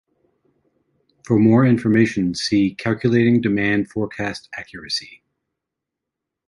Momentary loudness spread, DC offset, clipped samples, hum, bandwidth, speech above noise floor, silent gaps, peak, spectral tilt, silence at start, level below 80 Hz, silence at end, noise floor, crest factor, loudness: 12 LU; under 0.1%; under 0.1%; none; 11.5 kHz; 65 dB; none; -4 dBFS; -6.5 dB/octave; 1.3 s; -52 dBFS; 1.4 s; -83 dBFS; 16 dB; -18 LUFS